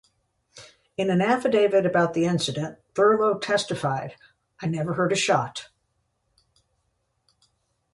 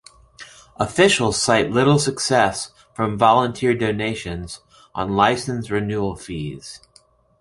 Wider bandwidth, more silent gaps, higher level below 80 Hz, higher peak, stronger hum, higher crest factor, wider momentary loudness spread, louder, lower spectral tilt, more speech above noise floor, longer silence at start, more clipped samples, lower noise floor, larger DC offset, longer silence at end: about the same, 11.5 kHz vs 11.5 kHz; neither; second, -66 dBFS vs -46 dBFS; second, -8 dBFS vs -2 dBFS; neither; about the same, 18 dB vs 20 dB; second, 12 LU vs 17 LU; second, -23 LUFS vs -19 LUFS; about the same, -5 dB/octave vs -4.5 dB/octave; first, 50 dB vs 36 dB; first, 0.55 s vs 0.4 s; neither; first, -73 dBFS vs -56 dBFS; neither; first, 2.3 s vs 0.65 s